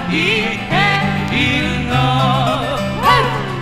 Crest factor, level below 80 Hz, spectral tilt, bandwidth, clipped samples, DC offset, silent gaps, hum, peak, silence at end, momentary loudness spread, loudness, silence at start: 14 dB; -34 dBFS; -5.5 dB/octave; 15.5 kHz; under 0.1%; under 0.1%; none; none; 0 dBFS; 0 s; 4 LU; -15 LUFS; 0 s